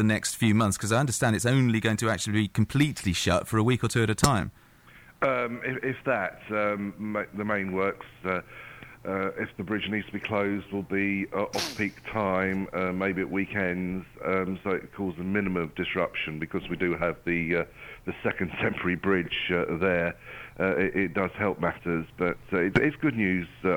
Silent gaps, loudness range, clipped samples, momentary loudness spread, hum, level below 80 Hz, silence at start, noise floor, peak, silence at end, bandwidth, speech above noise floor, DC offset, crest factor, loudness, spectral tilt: none; 5 LU; under 0.1%; 8 LU; none; -52 dBFS; 0 s; -53 dBFS; -8 dBFS; 0 s; 19.5 kHz; 26 dB; under 0.1%; 20 dB; -28 LUFS; -5 dB/octave